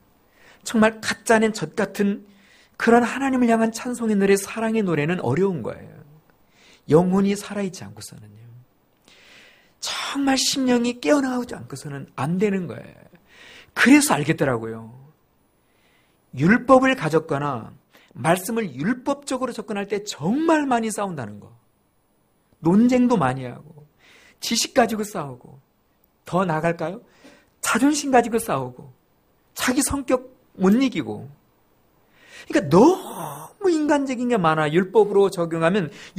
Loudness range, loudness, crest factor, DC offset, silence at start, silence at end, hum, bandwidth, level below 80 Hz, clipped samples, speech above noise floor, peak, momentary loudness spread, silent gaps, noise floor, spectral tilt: 5 LU; -21 LUFS; 20 dB; under 0.1%; 0.65 s; 0.1 s; none; 15.5 kHz; -56 dBFS; under 0.1%; 43 dB; -2 dBFS; 16 LU; none; -64 dBFS; -5 dB/octave